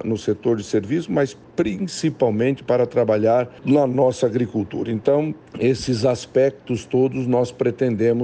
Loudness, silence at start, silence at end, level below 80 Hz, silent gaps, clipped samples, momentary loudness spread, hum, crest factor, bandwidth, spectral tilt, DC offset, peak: -21 LUFS; 0 s; 0 s; -54 dBFS; none; under 0.1%; 6 LU; none; 16 dB; 9.6 kHz; -7 dB/octave; under 0.1%; -4 dBFS